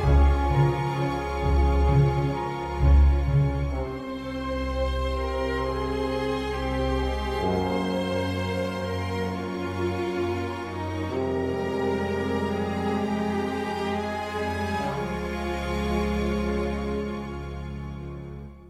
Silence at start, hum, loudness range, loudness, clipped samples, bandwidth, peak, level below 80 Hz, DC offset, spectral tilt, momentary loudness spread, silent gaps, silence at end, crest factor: 0 s; none; 5 LU; -27 LUFS; under 0.1%; 12.5 kHz; -10 dBFS; -30 dBFS; under 0.1%; -7.5 dB/octave; 10 LU; none; 0 s; 16 dB